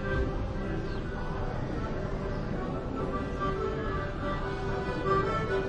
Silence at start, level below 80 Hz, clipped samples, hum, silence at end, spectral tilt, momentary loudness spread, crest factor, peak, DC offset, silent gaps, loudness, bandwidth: 0 s; -38 dBFS; under 0.1%; none; 0 s; -7.5 dB/octave; 6 LU; 16 dB; -14 dBFS; under 0.1%; none; -33 LUFS; 9 kHz